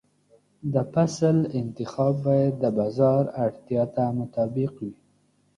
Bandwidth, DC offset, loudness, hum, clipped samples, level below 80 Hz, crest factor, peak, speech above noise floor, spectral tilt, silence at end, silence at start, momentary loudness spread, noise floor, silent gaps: 10.5 kHz; under 0.1%; -25 LUFS; 50 Hz at -45 dBFS; under 0.1%; -62 dBFS; 16 dB; -8 dBFS; 41 dB; -8.5 dB/octave; 0.65 s; 0.65 s; 9 LU; -65 dBFS; none